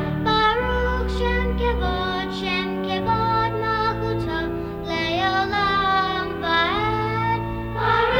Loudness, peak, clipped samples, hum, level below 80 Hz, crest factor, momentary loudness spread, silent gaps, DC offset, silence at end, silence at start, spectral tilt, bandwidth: -22 LUFS; -6 dBFS; under 0.1%; none; -32 dBFS; 16 dB; 6 LU; none; under 0.1%; 0 s; 0 s; -6 dB/octave; 17 kHz